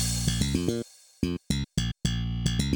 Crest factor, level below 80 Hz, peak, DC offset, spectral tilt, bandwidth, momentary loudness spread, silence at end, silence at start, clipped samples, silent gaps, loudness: 16 dB; -36 dBFS; -12 dBFS; under 0.1%; -4.5 dB/octave; over 20 kHz; 6 LU; 0 s; 0 s; under 0.1%; none; -29 LUFS